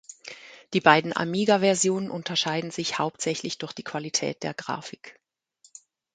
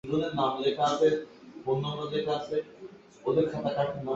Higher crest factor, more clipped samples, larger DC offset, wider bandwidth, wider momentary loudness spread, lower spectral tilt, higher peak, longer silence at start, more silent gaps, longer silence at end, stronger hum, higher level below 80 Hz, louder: first, 24 dB vs 16 dB; neither; neither; first, 9.6 kHz vs 8 kHz; first, 21 LU vs 15 LU; second, -3.5 dB/octave vs -6 dB/octave; first, -2 dBFS vs -12 dBFS; about the same, 0.1 s vs 0.05 s; neither; first, 1.05 s vs 0 s; neither; second, -72 dBFS vs -64 dBFS; first, -25 LUFS vs -29 LUFS